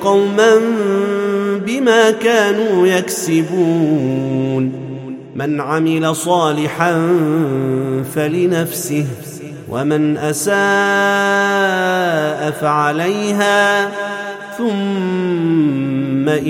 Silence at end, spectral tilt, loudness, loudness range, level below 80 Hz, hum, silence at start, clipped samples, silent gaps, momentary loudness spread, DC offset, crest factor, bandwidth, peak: 0 s; -5 dB/octave; -15 LUFS; 3 LU; -60 dBFS; none; 0 s; under 0.1%; none; 9 LU; under 0.1%; 14 dB; 16.5 kHz; 0 dBFS